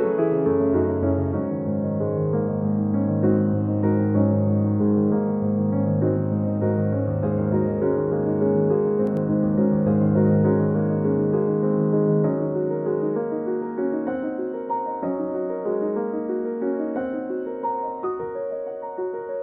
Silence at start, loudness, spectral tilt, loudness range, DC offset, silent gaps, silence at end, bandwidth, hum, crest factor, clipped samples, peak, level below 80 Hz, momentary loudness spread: 0 s; -23 LUFS; -12 dB/octave; 6 LU; under 0.1%; none; 0 s; 2.7 kHz; none; 16 dB; under 0.1%; -6 dBFS; -54 dBFS; 7 LU